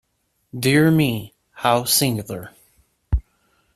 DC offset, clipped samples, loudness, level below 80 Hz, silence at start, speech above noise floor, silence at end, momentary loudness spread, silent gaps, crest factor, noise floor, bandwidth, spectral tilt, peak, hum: under 0.1%; under 0.1%; -19 LUFS; -34 dBFS; 0.55 s; 50 dB; 0.55 s; 18 LU; none; 20 dB; -68 dBFS; 15.5 kHz; -4.5 dB/octave; -2 dBFS; none